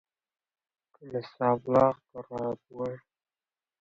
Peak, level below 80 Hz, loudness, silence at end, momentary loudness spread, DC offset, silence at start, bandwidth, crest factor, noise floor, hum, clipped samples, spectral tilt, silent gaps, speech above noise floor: -10 dBFS; -66 dBFS; -29 LUFS; 0.85 s; 16 LU; under 0.1%; 1 s; 7.4 kHz; 22 dB; under -90 dBFS; none; under 0.1%; -8.5 dB/octave; none; over 61 dB